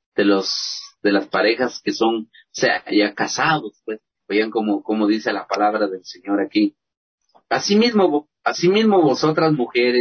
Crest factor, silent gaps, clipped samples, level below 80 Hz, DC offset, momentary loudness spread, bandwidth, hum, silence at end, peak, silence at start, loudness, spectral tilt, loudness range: 14 dB; 6.97-7.18 s; under 0.1%; -64 dBFS; under 0.1%; 9 LU; 6.6 kHz; none; 0 s; -4 dBFS; 0.15 s; -19 LUFS; -4.5 dB/octave; 3 LU